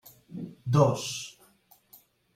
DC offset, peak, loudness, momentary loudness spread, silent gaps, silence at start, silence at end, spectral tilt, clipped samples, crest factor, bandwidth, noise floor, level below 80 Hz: under 0.1%; -8 dBFS; -27 LUFS; 20 LU; none; 0.3 s; 1.05 s; -6 dB/octave; under 0.1%; 22 dB; 16 kHz; -62 dBFS; -66 dBFS